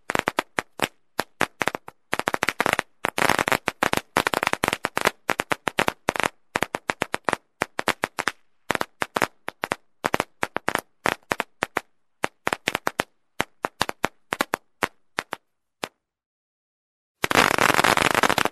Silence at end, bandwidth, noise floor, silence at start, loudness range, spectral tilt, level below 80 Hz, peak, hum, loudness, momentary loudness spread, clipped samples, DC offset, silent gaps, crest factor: 0 s; 14 kHz; under -90 dBFS; 0.1 s; 6 LU; -2.5 dB/octave; -54 dBFS; -2 dBFS; none; -25 LUFS; 12 LU; under 0.1%; 0.1%; 16.26-17.15 s; 24 dB